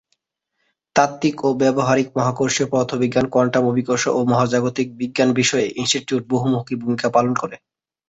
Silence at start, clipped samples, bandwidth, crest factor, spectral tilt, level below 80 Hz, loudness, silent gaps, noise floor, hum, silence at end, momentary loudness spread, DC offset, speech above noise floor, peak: 0.95 s; under 0.1%; 8 kHz; 18 dB; -4.5 dB/octave; -56 dBFS; -19 LUFS; none; -74 dBFS; none; 0.5 s; 5 LU; under 0.1%; 56 dB; -2 dBFS